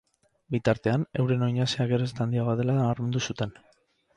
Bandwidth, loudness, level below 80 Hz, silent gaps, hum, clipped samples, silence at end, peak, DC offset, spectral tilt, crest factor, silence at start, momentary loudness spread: 9.6 kHz; -27 LUFS; -58 dBFS; none; none; under 0.1%; 0.65 s; -8 dBFS; under 0.1%; -6.5 dB/octave; 18 dB; 0.5 s; 6 LU